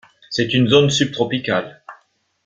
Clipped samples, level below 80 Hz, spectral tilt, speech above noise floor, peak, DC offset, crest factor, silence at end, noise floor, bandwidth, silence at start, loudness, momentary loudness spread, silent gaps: under 0.1%; -54 dBFS; -5 dB/octave; 42 dB; 0 dBFS; under 0.1%; 18 dB; 0.5 s; -59 dBFS; 9.2 kHz; 0.3 s; -17 LUFS; 10 LU; none